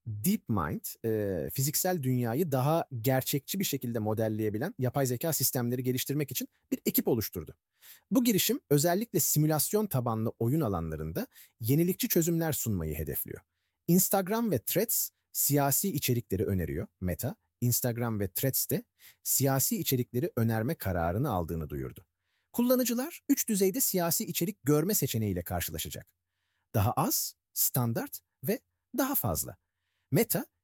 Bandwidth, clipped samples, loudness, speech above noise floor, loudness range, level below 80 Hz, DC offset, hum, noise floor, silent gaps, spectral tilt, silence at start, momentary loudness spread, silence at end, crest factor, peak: 19 kHz; under 0.1%; -30 LUFS; 51 dB; 3 LU; -54 dBFS; under 0.1%; none; -81 dBFS; none; -5 dB/octave; 0.05 s; 10 LU; 0.2 s; 18 dB; -12 dBFS